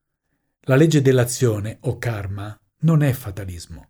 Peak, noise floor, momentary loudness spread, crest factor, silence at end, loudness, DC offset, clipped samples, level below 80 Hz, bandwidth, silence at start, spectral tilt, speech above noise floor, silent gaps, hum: -4 dBFS; -73 dBFS; 17 LU; 16 dB; 0.1 s; -19 LUFS; under 0.1%; under 0.1%; -50 dBFS; over 20 kHz; 0.7 s; -6.5 dB/octave; 54 dB; none; none